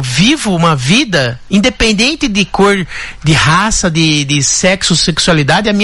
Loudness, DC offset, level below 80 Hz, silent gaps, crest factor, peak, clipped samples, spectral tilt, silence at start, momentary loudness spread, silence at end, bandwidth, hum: -10 LUFS; under 0.1%; -30 dBFS; none; 10 dB; 0 dBFS; under 0.1%; -3.5 dB/octave; 0 s; 4 LU; 0 s; 12 kHz; none